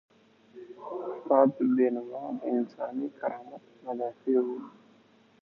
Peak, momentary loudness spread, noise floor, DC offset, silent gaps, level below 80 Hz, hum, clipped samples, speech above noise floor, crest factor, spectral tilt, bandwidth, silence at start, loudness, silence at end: -8 dBFS; 21 LU; -61 dBFS; under 0.1%; none; -86 dBFS; none; under 0.1%; 33 dB; 22 dB; -9.5 dB/octave; 5.2 kHz; 0.55 s; -29 LUFS; 0.75 s